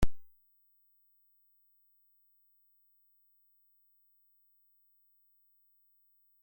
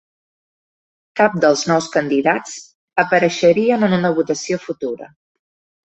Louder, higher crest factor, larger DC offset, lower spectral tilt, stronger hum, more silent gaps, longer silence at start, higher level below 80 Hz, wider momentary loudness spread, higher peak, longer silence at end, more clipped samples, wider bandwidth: second, -58 LUFS vs -17 LUFS; first, 24 dB vs 16 dB; neither; about the same, -6 dB/octave vs -5 dB/octave; first, 50 Hz at -115 dBFS vs none; second, none vs 2.75-2.88 s; second, 0 s vs 1.15 s; first, -48 dBFS vs -62 dBFS; second, 0 LU vs 13 LU; second, -14 dBFS vs -2 dBFS; first, 6.2 s vs 0.8 s; neither; first, 16.5 kHz vs 8.2 kHz